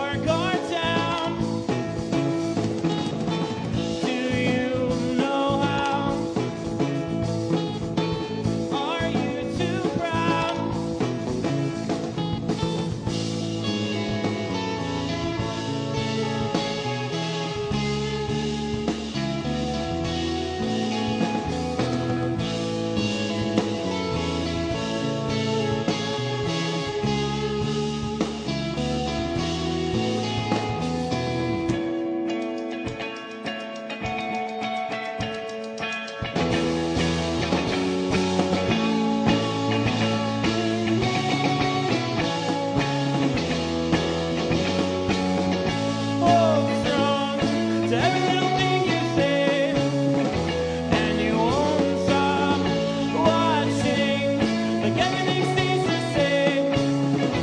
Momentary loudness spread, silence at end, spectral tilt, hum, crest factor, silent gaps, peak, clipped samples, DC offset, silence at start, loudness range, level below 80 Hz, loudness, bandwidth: 6 LU; 0 s; -5.5 dB/octave; none; 20 dB; none; -4 dBFS; under 0.1%; under 0.1%; 0 s; 5 LU; -46 dBFS; -24 LUFS; 10.5 kHz